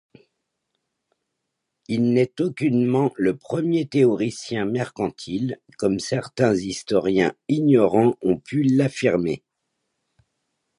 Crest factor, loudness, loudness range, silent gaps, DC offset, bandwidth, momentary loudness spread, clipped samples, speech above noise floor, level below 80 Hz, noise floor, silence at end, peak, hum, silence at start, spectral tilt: 18 dB; -22 LUFS; 3 LU; none; under 0.1%; 11.5 kHz; 9 LU; under 0.1%; 59 dB; -58 dBFS; -79 dBFS; 1.4 s; -4 dBFS; none; 1.9 s; -6.5 dB/octave